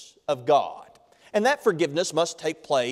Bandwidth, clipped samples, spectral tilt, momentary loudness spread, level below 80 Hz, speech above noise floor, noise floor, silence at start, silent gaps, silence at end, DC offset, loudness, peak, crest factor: 15.5 kHz; under 0.1%; -4 dB/octave; 9 LU; -72 dBFS; 30 dB; -54 dBFS; 0 s; none; 0 s; under 0.1%; -25 LUFS; -8 dBFS; 16 dB